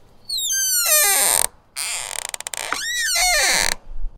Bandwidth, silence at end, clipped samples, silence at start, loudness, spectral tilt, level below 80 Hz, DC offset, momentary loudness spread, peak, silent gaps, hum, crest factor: 19 kHz; 0.1 s; under 0.1%; 0.3 s; -18 LUFS; 1.5 dB/octave; -36 dBFS; under 0.1%; 13 LU; 0 dBFS; none; none; 20 dB